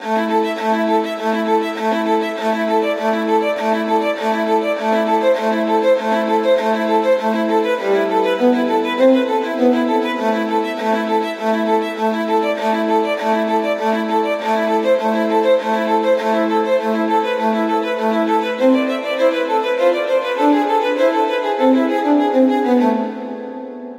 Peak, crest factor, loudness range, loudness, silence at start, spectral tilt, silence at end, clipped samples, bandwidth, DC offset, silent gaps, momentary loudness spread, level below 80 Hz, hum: -4 dBFS; 14 dB; 2 LU; -17 LUFS; 0 s; -5.5 dB/octave; 0 s; under 0.1%; 16 kHz; under 0.1%; none; 4 LU; -80 dBFS; none